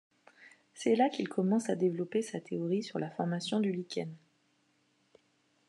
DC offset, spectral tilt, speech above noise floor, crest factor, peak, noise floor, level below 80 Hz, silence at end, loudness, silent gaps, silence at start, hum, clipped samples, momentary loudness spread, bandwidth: under 0.1%; -6 dB/octave; 41 dB; 18 dB; -16 dBFS; -73 dBFS; -90 dBFS; 1.5 s; -33 LUFS; none; 0.4 s; none; under 0.1%; 9 LU; 11 kHz